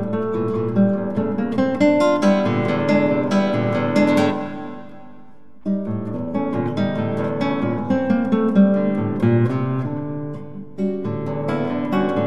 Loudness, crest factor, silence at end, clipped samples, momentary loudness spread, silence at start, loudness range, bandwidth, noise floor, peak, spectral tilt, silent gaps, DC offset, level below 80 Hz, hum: -20 LUFS; 16 dB; 0 s; under 0.1%; 10 LU; 0 s; 5 LU; 10 kHz; -48 dBFS; -4 dBFS; -8 dB/octave; none; 1%; -60 dBFS; none